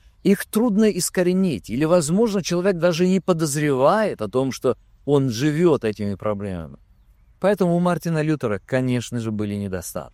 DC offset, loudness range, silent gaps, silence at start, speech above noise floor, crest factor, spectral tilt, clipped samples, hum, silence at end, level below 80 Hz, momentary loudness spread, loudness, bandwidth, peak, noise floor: under 0.1%; 4 LU; none; 0.25 s; 33 dB; 16 dB; -6 dB/octave; under 0.1%; none; 0.05 s; -52 dBFS; 8 LU; -21 LUFS; 15.5 kHz; -4 dBFS; -54 dBFS